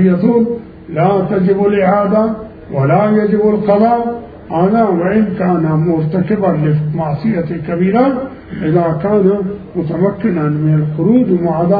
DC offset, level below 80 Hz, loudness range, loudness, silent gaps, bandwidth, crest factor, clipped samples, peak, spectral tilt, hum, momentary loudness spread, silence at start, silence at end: under 0.1%; -44 dBFS; 2 LU; -13 LUFS; none; 4.9 kHz; 12 dB; under 0.1%; 0 dBFS; -12.5 dB/octave; none; 9 LU; 0 s; 0 s